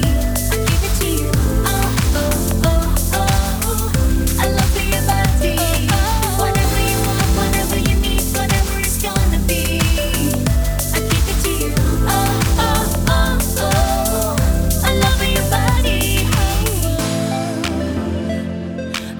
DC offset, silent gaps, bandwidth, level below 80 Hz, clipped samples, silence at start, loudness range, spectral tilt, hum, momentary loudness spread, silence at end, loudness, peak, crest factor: under 0.1%; none; over 20 kHz; -20 dBFS; under 0.1%; 0 s; 1 LU; -4.5 dB/octave; none; 3 LU; 0 s; -17 LUFS; -2 dBFS; 14 dB